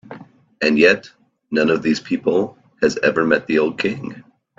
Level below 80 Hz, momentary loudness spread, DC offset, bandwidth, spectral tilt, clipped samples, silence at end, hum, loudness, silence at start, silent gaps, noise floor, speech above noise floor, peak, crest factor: -60 dBFS; 9 LU; under 0.1%; 7.8 kHz; -5 dB/octave; under 0.1%; 0.4 s; none; -18 LUFS; 0.1 s; none; -40 dBFS; 23 dB; 0 dBFS; 20 dB